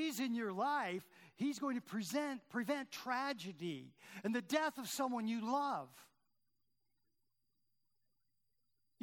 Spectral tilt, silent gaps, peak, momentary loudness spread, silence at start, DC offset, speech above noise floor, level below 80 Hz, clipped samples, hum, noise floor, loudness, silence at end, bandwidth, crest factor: -4 dB/octave; none; -20 dBFS; 8 LU; 0 s; under 0.1%; 47 dB; under -90 dBFS; under 0.1%; none; -88 dBFS; -41 LUFS; 2.95 s; 19 kHz; 22 dB